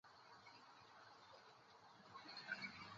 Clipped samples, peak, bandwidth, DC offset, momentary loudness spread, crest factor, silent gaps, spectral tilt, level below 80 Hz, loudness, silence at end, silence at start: under 0.1%; -34 dBFS; 7.4 kHz; under 0.1%; 15 LU; 24 dB; none; -0.5 dB/octave; -90 dBFS; -57 LUFS; 0 s; 0.05 s